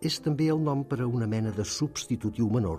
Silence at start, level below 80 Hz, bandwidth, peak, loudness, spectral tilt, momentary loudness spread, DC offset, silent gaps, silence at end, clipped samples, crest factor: 0 s; -52 dBFS; 15 kHz; -16 dBFS; -29 LUFS; -6 dB/octave; 5 LU; under 0.1%; none; 0 s; under 0.1%; 12 dB